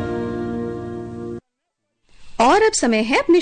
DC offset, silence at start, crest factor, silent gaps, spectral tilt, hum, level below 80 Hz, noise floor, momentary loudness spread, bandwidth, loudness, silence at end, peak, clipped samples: under 0.1%; 0 s; 14 dB; none; -4 dB/octave; none; -46 dBFS; -76 dBFS; 18 LU; 9.4 kHz; -18 LUFS; 0 s; -6 dBFS; under 0.1%